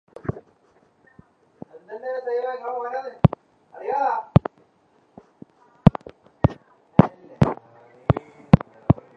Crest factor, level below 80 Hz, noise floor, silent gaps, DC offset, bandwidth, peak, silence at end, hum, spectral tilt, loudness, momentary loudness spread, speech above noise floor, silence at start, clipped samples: 24 dB; -40 dBFS; -61 dBFS; none; under 0.1%; 6.4 kHz; 0 dBFS; 0.25 s; none; -10 dB/octave; -23 LUFS; 18 LU; 33 dB; 0.3 s; under 0.1%